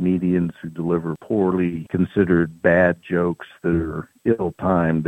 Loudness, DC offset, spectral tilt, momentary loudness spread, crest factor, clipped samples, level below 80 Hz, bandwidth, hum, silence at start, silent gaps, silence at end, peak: -21 LUFS; under 0.1%; -9.5 dB/octave; 8 LU; 18 dB; under 0.1%; -46 dBFS; 8.4 kHz; none; 0 s; none; 0 s; -2 dBFS